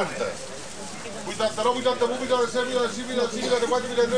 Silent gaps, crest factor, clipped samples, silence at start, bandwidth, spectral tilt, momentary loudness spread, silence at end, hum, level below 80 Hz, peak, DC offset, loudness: none; 16 dB; under 0.1%; 0 s; 10.5 kHz; -3 dB/octave; 12 LU; 0 s; none; -56 dBFS; -10 dBFS; 0.8%; -25 LUFS